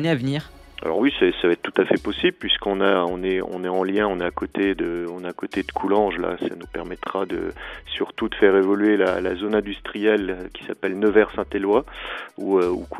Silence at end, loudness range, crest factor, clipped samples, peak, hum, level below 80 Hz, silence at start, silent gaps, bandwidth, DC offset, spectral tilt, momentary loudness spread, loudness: 0 s; 4 LU; 20 dB; under 0.1%; -2 dBFS; none; -46 dBFS; 0 s; none; 12 kHz; under 0.1%; -6.5 dB/octave; 12 LU; -22 LUFS